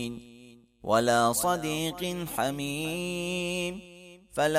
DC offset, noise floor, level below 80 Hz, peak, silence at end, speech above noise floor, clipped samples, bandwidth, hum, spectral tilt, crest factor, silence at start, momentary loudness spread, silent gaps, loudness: under 0.1%; -54 dBFS; -58 dBFS; -10 dBFS; 0 s; 25 dB; under 0.1%; 16 kHz; none; -4 dB/octave; 18 dB; 0 s; 15 LU; none; -29 LUFS